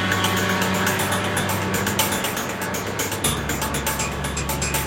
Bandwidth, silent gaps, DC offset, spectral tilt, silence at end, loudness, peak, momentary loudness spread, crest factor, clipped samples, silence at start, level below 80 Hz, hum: 17 kHz; none; under 0.1%; -3 dB/octave; 0 s; -22 LUFS; -4 dBFS; 5 LU; 20 dB; under 0.1%; 0 s; -38 dBFS; none